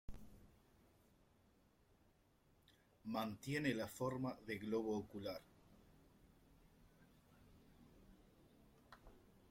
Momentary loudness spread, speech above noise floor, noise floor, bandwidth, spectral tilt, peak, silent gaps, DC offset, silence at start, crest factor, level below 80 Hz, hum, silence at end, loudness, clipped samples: 23 LU; 31 dB; -75 dBFS; 16.5 kHz; -6 dB/octave; -26 dBFS; none; under 0.1%; 0.1 s; 24 dB; -70 dBFS; none; 0.2 s; -45 LUFS; under 0.1%